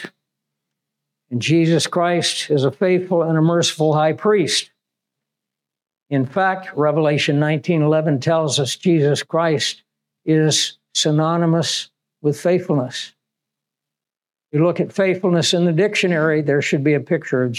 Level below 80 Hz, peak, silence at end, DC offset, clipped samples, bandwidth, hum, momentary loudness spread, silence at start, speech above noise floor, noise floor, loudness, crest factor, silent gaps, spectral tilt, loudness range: -76 dBFS; -6 dBFS; 0 s; under 0.1%; under 0.1%; 13.5 kHz; none; 7 LU; 0 s; 69 dB; -87 dBFS; -18 LUFS; 12 dB; none; -5 dB/octave; 4 LU